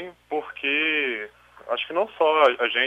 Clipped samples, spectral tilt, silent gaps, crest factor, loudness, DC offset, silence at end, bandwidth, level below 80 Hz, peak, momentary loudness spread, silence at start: under 0.1%; -3.5 dB/octave; none; 18 dB; -23 LUFS; under 0.1%; 0 s; 9.2 kHz; -68 dBFS; -6 dBFS; 13 LU; 0 s